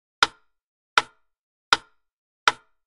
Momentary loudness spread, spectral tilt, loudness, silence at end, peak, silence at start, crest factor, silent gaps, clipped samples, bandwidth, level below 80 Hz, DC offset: 1 LU; 0 dB/octave; -24 LUFS; 0.35 s; 0 dBFS; 0.2 s; 28 dB; 0.64-0.96 s, 1.39-1.72 s, 2.13-2.47 s; under 0.1%; 11.5 kHz; -60 dBFS; under 0.1%